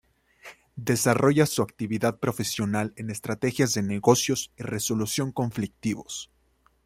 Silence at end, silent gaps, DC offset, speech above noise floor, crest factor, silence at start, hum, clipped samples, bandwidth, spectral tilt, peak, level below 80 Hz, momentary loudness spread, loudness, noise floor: 0.6 s; none; under 0.1%; 40 dB; 22 dB; 0.45 s; none; under 0.1%; 16 kHz; -4.5 dB/octave; -4 dBFS; -60 dBFS; 12 LU; -26 LUFS; -65 dBFS